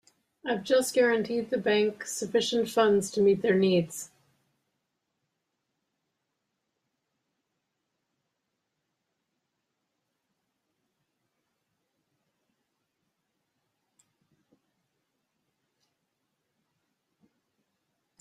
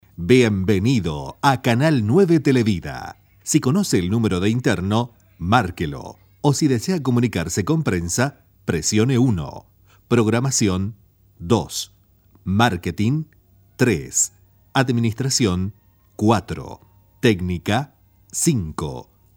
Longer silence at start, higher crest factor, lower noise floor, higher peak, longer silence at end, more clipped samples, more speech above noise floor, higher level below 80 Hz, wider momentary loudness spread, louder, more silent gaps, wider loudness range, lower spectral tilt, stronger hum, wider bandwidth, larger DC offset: first, 0.45 s vs 0.2 s; about the same, 20 dB vs 20 dB; first, -82 dBFS vs -55 dBFS; second, -12 dBFS vs 0 dBFS; first, 14.15 s vs 0.35 s; neither; first, 57 dB vs 36 dB; second, -74 dBFS vs -46 dBFS; second, 11 LU vs 14 LU; second, -26 LUFS vs -20 LUFS; neither; first, 7 LU vs 4 LU; about the same, -4.5 dB/octave vs -5 dB/octave; neither; second, 15.5 kHz vs 19 kHz; neither